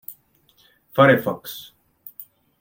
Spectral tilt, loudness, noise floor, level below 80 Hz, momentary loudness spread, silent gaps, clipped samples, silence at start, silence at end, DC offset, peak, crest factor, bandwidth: -6.5 dB/octave; -19 LUFS; -60 dBFS; -64 dBFS; 25 LU; none; under 0.1%; 0.1 s; 0.4 s; under 0.1%; -2 dBFS; 22 dB; 17 kHz